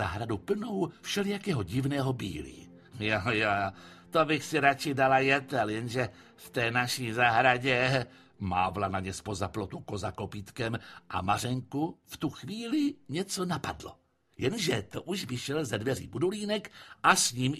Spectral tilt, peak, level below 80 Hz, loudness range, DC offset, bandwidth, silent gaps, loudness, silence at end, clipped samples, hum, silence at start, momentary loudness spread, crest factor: -4.5 dB/octave; -6 dBFS; -58 dBFS; 7 LU; under 0.1%; 15 kHz; none; -30 LUFS; 0 s; under 0.1%; none; 0 s; 13 LU; 24 dB